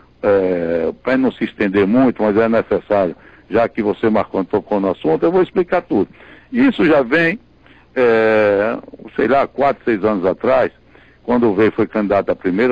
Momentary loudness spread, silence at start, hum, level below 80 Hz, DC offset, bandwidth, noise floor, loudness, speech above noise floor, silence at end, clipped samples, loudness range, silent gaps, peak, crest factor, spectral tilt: 7 LU; 0.25 s; none; -48 dBFS; 0.1%; 7 kHz; -47 dBFS; -16 LUFS; 32 dB; 0 s; under 0.1%; 2 LU; none; -6 dBFS; 10 dB; -8.5 dB/octave